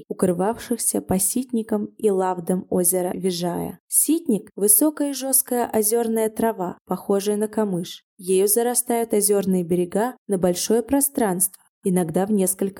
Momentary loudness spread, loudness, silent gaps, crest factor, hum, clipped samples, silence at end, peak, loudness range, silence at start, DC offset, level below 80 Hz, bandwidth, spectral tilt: 8 LU; -21 LUFS; 3.80-3.88 s, 6.81-6.85 s, 8.03-8.17 s, 10.18-10.26 s, 11.69-11.82 s; 20 dB; none; under 0.1%; 0 s; 0 dBFS; 3 LU; 0 s; under 0.1%; -56 dBFS; 18 kHz; -4.5 dB/octave